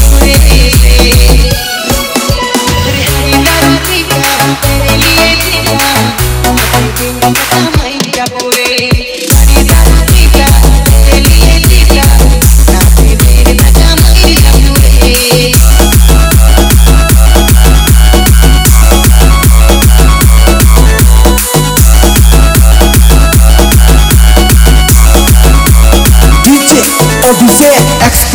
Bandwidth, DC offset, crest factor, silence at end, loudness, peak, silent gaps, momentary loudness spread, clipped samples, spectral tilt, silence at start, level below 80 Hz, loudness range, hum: over 20 kHz; under 0.1%; 4 dB; 0 s; -5 LUFS; 0 dBFS; none; 4 LU; 30%; -4 dB/octave; 0 s; -6 dBFS; 3 LU; none